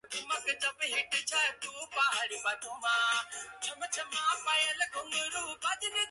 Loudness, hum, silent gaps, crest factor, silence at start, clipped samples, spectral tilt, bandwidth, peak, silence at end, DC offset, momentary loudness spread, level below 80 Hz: -32 LUFS; none; none; 16 dB; 0.05 s; under 0.1%; 2 dB/octave; 12 kHz; -16 dBFS; 0 s; under 0.1%; 8 LU; -76 dBFS